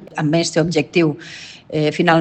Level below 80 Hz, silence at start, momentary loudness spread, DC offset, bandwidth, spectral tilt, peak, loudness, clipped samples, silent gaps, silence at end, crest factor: -56 dBFS; 0 s; 15 LU; under 0.1%; 9 kHz; -5.5 dB/octave; 0 dBFS; -18 LUFS; under 0.1%; none; 0 s; 18 dB